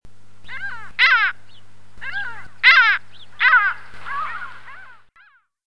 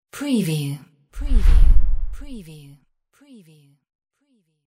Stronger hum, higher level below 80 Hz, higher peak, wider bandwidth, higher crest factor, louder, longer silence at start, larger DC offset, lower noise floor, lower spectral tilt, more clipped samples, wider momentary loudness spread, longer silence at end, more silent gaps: neither; second, -58 dBFS vs -20 dBFS; about the same, 0 dBFS vs 0 dBFS; second, 11 kHz vs 13.5 kHz; about the same, 20 dB vs 18 dB; first, -16 LUFS vs -23 LUFS; second, 0 s vs 0.15 s; first, 2% vs under 0.1%; second, -54 dBFS vs -66 dBFS; second, -0.5 dB/octave vs -6.5 dB/octave; neither; about the same, 21 LU vs 22 LU; second, 0 s vs 2.15 s; neither